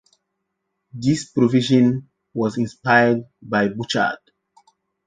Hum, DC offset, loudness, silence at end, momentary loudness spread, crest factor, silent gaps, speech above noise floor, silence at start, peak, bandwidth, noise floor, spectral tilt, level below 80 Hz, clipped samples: none; under 0.1%; -20 LUFS; 0.9 s; 12 LU; 18 dB; none; 58 dB; 0.95 s; -4 dBFS; 9.4 kHz; -77 dBFS; -6 dB/octave; -60 dBFS; under 0.1%